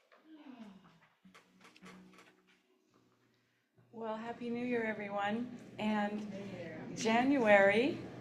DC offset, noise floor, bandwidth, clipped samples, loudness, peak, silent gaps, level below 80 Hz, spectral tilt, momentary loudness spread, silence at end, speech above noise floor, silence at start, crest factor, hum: under 0.1%; -76 dBFS; 11 kHz; under 0.1%; -34 LUFS; -14 dBFS; none; -78 dBFS; -5 dB/octave; 20 LU; 0 s; 42 dB; 0.3 s; 24 dB; none